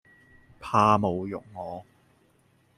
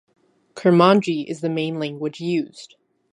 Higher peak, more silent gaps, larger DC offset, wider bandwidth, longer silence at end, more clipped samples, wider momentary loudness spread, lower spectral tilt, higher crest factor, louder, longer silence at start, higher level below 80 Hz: second, -6 dBFS vs 0 dBFS; neither; neither; about the same, 11 kHz vs 10.5 kHz; first, 0.95 s vs 0.45 s; neither; first, 20 LU vs 12 LU; about the same, -7 dB/octave vs -7 dB/octave; about the same, 22 dB vs 20 dB; second, -26 LUFS vs -20 LUFS; about the same, 0.6 s vs 0.55 s; first, -60 dBFS vs -72 dBFS